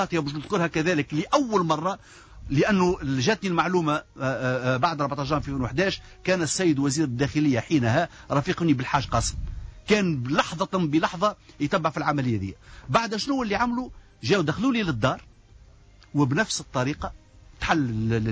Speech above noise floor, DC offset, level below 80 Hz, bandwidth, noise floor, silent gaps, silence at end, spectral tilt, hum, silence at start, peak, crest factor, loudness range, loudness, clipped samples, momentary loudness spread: 27 dB; under 0.1%; -44 dBFS; 8 kHz; -52 dBFS; none; 0 s; -5.5 dB/octave; none; 0 s; -10 dBFS; 16 dB; 2 LU; -25 LUFS; under 0.1%; 8 LU